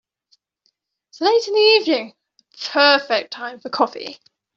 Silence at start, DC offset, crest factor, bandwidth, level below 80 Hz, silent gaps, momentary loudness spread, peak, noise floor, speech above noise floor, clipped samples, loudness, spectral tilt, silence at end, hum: 1.15 s; under 0.1%; 18 dB; 7.4 kHz; -74 dBFS; none; 17 LU; -2 dBFS; -69 dBFS; 51 dB; under 0.1%; -17 LUFS; -2 dB/octave; 0.4 s; none